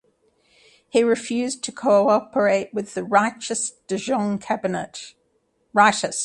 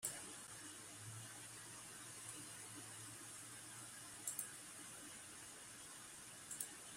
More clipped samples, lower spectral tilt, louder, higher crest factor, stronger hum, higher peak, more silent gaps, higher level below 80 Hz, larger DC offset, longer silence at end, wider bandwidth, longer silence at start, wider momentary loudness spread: neither; first, -3.5 dB/octave vs -1.5 dB/octave; first, -21 LUFS vs -51 LUFS; second, 20 dB vs 26 dB; neither; first, -2 dBFS vs -28 dBFS; neither; first, -66 dBFS vs -82 dBFS; neither; about the same, 0 s vs 0 s; second, 11.5 kHz vs 16 kHz; first, 0.95 s vs 0 s; first, 11 LU vs 7 LU